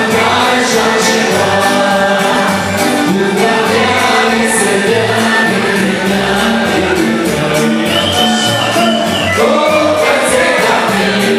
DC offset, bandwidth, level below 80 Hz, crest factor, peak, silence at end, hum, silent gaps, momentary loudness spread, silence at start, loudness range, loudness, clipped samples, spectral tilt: under 0.1%; 16 kHz; -42 dBFS; 10 dB; 0 dBFS; 0 s; none; none; 2 LU; 0 s; 1 LU; -10 LUFS; under 0.1%; -3.5 dB/octave